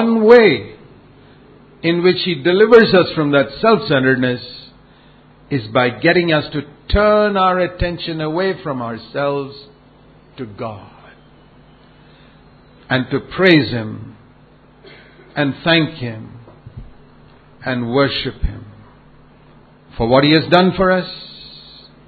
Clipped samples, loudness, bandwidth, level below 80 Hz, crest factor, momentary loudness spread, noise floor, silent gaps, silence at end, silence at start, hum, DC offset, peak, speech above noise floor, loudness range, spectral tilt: under 0.1%; -15 LUFS; 6.4 kHz; -36 dBFS; 18 dB; 22 LU; -47 dBFS; none; 0.5 s; 0 s; none; under 0.1%; 0 dBFS; 32 dB; 13 LU; -8 dB/octave